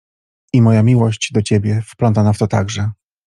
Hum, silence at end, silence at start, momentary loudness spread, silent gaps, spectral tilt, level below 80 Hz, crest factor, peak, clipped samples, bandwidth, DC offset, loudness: none; 0.35 s; 0.55 s; 9 LU; none; -7 dB/octave; -48 dBFS; 14 dB; -2 dBFS; under 0.1%; 11 kHz; under 0.1%; -15 LUFS